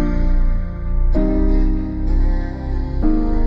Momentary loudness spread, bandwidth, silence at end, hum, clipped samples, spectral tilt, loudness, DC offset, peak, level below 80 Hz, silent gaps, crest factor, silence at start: 7 LU; 4 kHz; 0 s; none; under 0.1%; -10 dB/octave; -21 LUFS; under 0.1%; -4 dBFS; -16 dBFS; none; 12 dB; 0 s